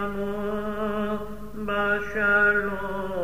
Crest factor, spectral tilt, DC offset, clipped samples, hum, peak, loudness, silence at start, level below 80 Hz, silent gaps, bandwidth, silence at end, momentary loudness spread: 16 dB; -6.5 dB/octave; 1%; under 0.1%; none; -10 dBFS; -25 LUFS; 0 s; -46 dBFS; none; 15.5 kHz; 0 s; 11 LU